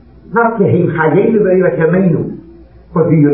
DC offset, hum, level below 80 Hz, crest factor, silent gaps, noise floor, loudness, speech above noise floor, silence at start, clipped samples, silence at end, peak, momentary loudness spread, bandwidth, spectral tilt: 0.2%; none; -44 dBFS; 12 dB; none; -38 dBFS; -12 LUFS; 27 dB; 0.3 s; under 0.1%; 0 s; 0 dBFS; 8 LU; 3.6 kHz; -14 dB/octave